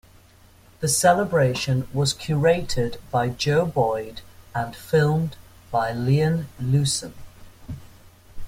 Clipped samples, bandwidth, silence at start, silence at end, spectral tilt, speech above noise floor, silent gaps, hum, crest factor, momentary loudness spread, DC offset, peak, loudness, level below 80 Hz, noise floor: under 0.1%; 16 kHz; 0.8 s; 0 s; -5 dB/octave; 30 dB; none; none; 20 dB; 14 LU; under 0.1%; -4 dBFS; -23 LUFS; -46 dBFS; -52 dBFS